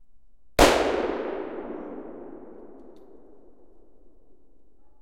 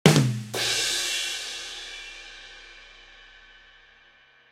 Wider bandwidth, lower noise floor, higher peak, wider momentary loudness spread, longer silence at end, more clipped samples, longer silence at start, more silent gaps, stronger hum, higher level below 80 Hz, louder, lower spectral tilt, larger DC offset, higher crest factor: about the same, 16 kHz vs 16 kHz; about the same, -59 dBFS vs -57 dBFS; about the same, -4 dBFS vs -2 dBFS; about the same, 27 LU vs 25 LU; first, 2.1 s vs 1.25 s; neither; first, 0.6 s vs 0.05 s; neither; neither; first, -42 dBFS vs -58 dBFS; about the same, -24 LUFS vs -26 LUFS; about the same, -3.5 dB/octave vs -3.5 dB/octave; first, 0.5% vs under 0.1%; about the same, 26 dB vs 26 dB